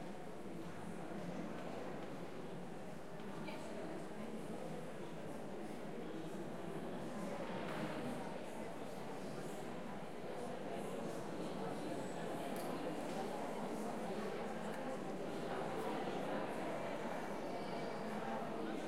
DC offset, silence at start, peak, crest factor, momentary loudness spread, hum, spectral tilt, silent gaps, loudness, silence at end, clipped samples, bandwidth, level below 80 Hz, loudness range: 0.3%; 0 s; -30 dBFS; 16 dB; 6 LU; none; -5.5 dB/octave; none; -46 LUFS; 0 s; under 0.1%; 16 kHz; -72 dBFS; 5 LU